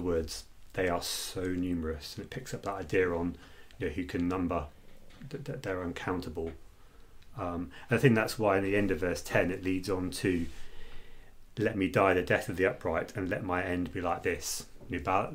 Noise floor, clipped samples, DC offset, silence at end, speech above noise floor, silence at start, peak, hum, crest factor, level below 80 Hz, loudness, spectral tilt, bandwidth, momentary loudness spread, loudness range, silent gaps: -52 dBFS; under 0.1%; under 0.1%; 0 s; 21 dB; 0 s; -10 dBFS; none; 22 dB; -50 dBFS; -32 LUFS; -5.5 dB/octave; 16 kHz; 14 LU; 7 LU; none